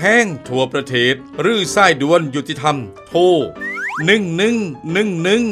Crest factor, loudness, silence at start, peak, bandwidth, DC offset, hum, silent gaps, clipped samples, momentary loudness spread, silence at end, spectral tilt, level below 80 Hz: 16 dB; -16 LUFS; 0 s; 0 dBFS; 13.5 kHz; under 0.1%; none; none; under 0.1%; 9 LU; 0 s; -4.5 dB/octave; -54 dBFS